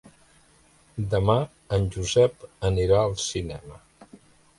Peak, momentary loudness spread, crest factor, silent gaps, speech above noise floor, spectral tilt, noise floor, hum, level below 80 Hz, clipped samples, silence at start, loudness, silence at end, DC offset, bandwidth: -6 dBFS; 13 LU; 20 dB; none; 34 dB; -5.5 dB/octave; -58 dBFS; none; -42 dBFS; under 0.1%; 0.95 s; -24 LUFS; 0.45 s; under 0.1%; 11.5 kHz